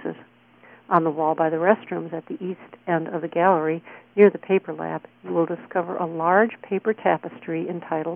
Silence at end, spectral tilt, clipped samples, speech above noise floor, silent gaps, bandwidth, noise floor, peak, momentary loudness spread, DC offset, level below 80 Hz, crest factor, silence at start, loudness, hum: 0 s; -10.5 dB/octave; under 0.1%; 30 dB; none; 3.6 kHz; -52 dBFS; -2 dBFS; 13 LU; under 0.1%; -72 dBFS; 20 dB; 0 s; -23 LUFS; none